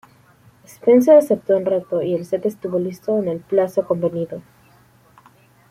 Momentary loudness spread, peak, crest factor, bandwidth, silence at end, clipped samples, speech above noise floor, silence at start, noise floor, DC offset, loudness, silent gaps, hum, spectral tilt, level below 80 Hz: 11 LU; -2 dBFS; 18 dB; 14.5 kHz; 1.3 s; under 0.1%; 35 dB; 0.85 s; -53 dBFS; under 0.1%; -18 LUFS; none; none; -8 dB/octave; -64 dBFS